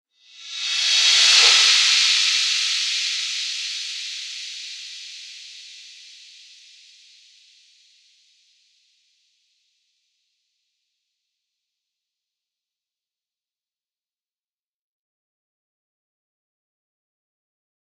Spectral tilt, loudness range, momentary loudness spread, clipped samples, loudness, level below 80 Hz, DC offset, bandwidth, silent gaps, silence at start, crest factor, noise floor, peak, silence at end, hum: 8.5 dB/octave; 23 LU; 25 LU; under 0.1%; -16 LUFS; under -90 dBFS; under 0.1%; 14 kHz; none; 0.4 s; 26 dB; under -90 dBFS; 0 dBFS; 12.05 s; none